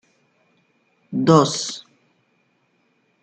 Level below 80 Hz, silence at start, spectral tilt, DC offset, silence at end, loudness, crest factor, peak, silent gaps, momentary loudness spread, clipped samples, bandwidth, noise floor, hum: -64 dBFS; 1.1 s; -5.5 dB/octave; under 0.1%; 1.4 s; -19 LUFS; 22 dB; -2 dBFS; none; 15 LU; under 0.1%; 9.2 kHz; -65 dBFS; none